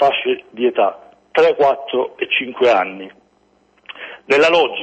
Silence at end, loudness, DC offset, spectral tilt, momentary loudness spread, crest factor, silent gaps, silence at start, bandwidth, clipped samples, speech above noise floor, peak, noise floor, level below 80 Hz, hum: 0 s; -16 LUFS; under 0.1%; -4 dB/octave; 20 LU; 14 dB; none; 0 s; 8.4 kHz; under 0.1%; 41 dB; -4 dBFS; -57 dBFS; -62 dBFS; none